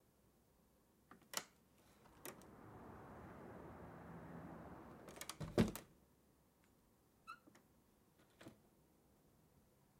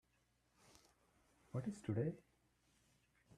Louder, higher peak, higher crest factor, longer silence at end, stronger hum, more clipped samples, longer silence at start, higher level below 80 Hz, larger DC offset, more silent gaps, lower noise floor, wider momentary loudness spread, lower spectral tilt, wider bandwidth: second, -49 LUFS vs -45 LUFS; first, -22 dBFS vs -28 dBFS; first, 30 dB vs 22 dB; second, 0.35 s vs 1.2 s; neither; neither; second, 1.1 s vs 1.55 s; first, -68 dBFS vs -78 dBFS; neither; neither; second, -75 dBFS vs -80 dBFS; first, 23 LU vs 8 LU; second, -5 dB/octave vs -8 dB/octave; first, 16 kHz vs 13 kHz